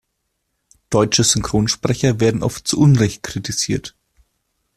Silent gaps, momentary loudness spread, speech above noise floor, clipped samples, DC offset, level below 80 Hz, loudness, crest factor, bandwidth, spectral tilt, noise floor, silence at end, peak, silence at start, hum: none; 9 LU; 56 dB; under 0.1%; under 0.1%; -42 dBFS; -17 LUFS; 18 dB; 14 kHz; -4.5 dB/octave; -73 dBFS; 0.85 s; -2 dBFS; 0.9 s; none